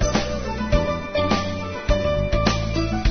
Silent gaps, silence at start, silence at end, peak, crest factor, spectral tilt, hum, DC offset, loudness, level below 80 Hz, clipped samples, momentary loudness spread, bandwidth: none; 0 s; 0 s; -4 dBFS; 18 dB; -5.5 dB/octave; none; under 0.1%; -23 LUFS; -28 dBFS; under 0.1%; 6 LU; 6.6 kHz